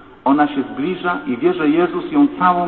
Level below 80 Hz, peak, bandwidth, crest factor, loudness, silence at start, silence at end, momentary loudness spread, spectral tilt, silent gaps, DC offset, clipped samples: -54 dBFS; -2 dBFS; 4.3 kHz; 16 dB; -17 LUFS; 0.25 s; 0 s; 7 LU; -10.5 dB/octave; none; 0.2%; under 0.1%